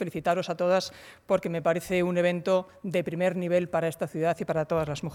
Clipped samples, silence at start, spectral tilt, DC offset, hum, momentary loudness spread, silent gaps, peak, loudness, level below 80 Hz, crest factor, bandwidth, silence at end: under 0.1%; 0 s; -6 dB/octave; under 0.1%; none; 4 LU; none; -12 dBFS; -27 LUFS; -60 dBFS; 16 dB; 17 kHz; 0 s